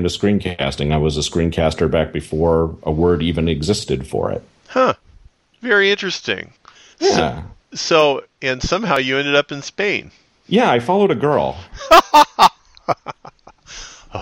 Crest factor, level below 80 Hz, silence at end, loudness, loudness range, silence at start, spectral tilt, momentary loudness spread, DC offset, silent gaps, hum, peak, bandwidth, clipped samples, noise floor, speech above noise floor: 18 dB; -36 dBFS; 0 s; -17 LUFS; 4 LU; 0 s; -5 dB/octave; 16 LU; under 0.1%; none; none; 0 dBFS; 12.5 kHz; under 0.1%; -49 dBFS; 32 dB